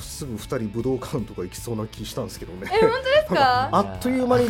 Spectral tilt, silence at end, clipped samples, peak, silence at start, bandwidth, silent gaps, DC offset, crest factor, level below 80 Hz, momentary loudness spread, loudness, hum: -5 dB/octave; 0 s; under 0.1%; -6 dBFS; 0 s; 17 kHz; none; under 0.1%; 18 dB; -44 dBFS; 14 LU; -23 LUFS; none